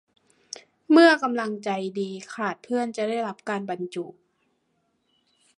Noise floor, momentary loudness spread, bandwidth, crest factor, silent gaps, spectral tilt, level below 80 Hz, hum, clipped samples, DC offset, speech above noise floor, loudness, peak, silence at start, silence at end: -72 dBFS; 24 LU; 10.5 kHz; 24 dB; none; -5 dB/octave; -80 dBFS; none; under 0.1%; under 0.1%; 48 dB; -24 LUFS; -2 dBFS; 0.9 s; 1.45 s